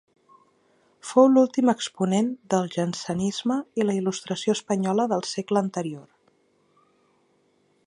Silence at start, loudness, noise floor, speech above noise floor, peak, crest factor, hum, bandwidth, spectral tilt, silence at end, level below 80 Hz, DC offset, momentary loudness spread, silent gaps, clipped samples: 1.05 s; -24 LUFS; -66 dBFS; 42 dB; -6 dBFS; 20 dB; none; 11 kHz; -5.5 dB/octave; 1.85 s; -68 dBFS; under 0.1%; 10 LU; none; under 0.1%